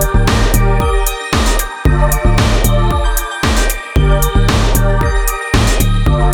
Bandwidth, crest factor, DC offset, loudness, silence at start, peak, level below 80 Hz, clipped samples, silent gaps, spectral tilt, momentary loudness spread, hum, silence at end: 19 kHz; 12 dB; under 0.1%; -14 LUFS; 0 s; 0 dBFS; -14 dBFS; under 0.1%; none; -5 dB/octave; 3 LU; none; 0 s